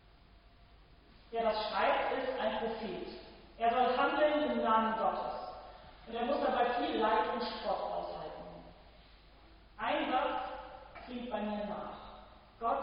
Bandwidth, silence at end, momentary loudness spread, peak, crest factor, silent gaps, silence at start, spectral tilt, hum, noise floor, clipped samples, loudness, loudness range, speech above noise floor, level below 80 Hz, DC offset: 5.4 kHz; 0 s; 20 LU; -16 dBFS; 20 dB; none; 0.35 s; -8 dB/octave; none; -60 dBFS; under 0.1%; -34 LUFS; 6 LU; 27 dB; -60 dBFS; under 0.1%